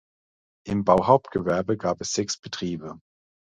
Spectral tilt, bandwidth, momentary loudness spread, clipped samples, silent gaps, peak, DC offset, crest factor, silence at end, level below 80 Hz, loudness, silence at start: -5 dB/octave; 9.6 kHz; 14 LU; under 0.1%; 2.39-2.43 s; -2 dBFS; under 0.1%; 24 dB; 0.55 s; -54 dBFS; -24 LUFS; 0.65 s